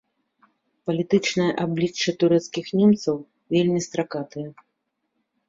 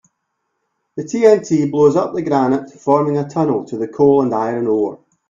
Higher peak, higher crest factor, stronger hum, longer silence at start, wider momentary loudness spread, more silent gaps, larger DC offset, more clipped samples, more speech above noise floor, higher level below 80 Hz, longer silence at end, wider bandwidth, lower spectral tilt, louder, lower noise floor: second, -6 dBFS vs 0 dBFS; about the same, 18 dB vs 16 dB; neither; about the same, 0.85 s vs 0.95 s; first, 13 LU vs 10 LU; neither; neither; neither; about the same, 55 dB vs 57 dB; second, -64 dBFS vs -58 dBFS; first, 0.95 s vs 0.35 s; about the same, 7.8 kHz vs 7.6 kHz; second, -5.5 dB/octave vs -7.5 dB/octave; second, -23 LUFS vs -16 LUFS; first, -77 dBFS vs -72 dBFS